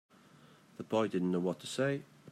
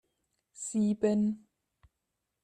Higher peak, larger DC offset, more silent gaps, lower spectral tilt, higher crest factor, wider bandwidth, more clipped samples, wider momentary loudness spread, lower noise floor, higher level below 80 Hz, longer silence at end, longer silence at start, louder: second, -20 dBFS vs -16 dBFS; neither; neither; about the same, -6 dB/octave vs -6.5 dB/octave; about the same, 16 dB vs 18 dB; first, 14.5 kHz vs 9.8 kHz; neither; about the same, 13 LU vs 13 LU; second, -61 dBFS vs -85 dBFS; second, -80 dBFS vs -70 dBFS; second, 0 s vs 1.05 s; first, 0.8 s vs 0.6 s; second, -35 LUFS vs -31 LUFS